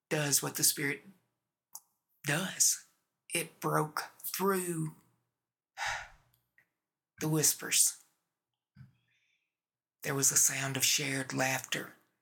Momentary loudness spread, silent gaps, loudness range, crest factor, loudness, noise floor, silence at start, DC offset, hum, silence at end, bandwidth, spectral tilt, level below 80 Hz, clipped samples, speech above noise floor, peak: 13 LU; none; 6 LU; 24 dB; -30 LUFS; under -90 dBFS; 0.1 s; under 0.1%; none; 0.3 s; 19 kHz; -2 dB/octave; -74 dBFS; under 0.1%; over 58 dB; -12 dBFS